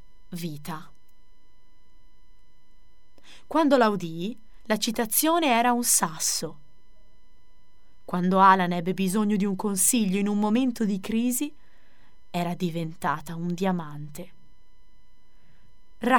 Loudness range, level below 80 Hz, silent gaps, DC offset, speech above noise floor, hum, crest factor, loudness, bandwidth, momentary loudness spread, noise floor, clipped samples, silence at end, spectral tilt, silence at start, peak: 9 LU; -58 dBFS; none; 1%; 37 dB; none; 22 dB; -24 LUFS; 18 kHz; 16 LU; -62 dBFS; under 0.1%; 0 s; -4 dB/octave; 0.3 s; -4 dBFS